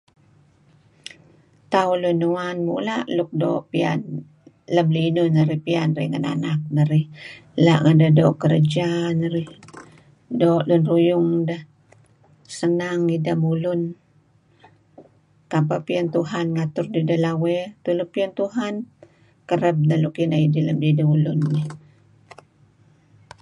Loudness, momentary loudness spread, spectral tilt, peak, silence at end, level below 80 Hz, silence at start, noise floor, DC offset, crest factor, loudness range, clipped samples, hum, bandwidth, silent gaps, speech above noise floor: -21 LUFS; 11 LU; -8 dB/octave; -4 dBFS; 1.65 s; -64 dBFS; 1.7 s; -58 dBFS; under 0.1%; 18 dB; 6 LU; under 0.1%; none; 10.5 kHz; none; 38 dB